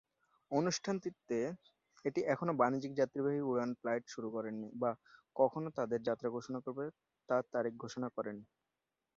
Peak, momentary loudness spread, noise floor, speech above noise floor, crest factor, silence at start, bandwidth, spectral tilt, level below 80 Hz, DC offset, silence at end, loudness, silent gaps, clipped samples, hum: -16 dBFS; 9 LU; -89 dBFS; 52 dB; 22 dB; 0.5 s; 7.4 kHz; -5.5 dB/octave; -80 dBFS; under 0.1%; 0.75 s; -38 LUFS; none; under 0.1%; none